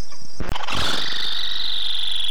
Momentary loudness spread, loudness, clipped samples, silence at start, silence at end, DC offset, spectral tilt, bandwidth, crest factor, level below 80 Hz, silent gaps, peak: 10 LU; -23 LUFS; under 0.1%; 0 s; 0 s; 20%; -2 dB/octave; 19 kHz; 12 dB; -38 dBFS; none; -10 dBFS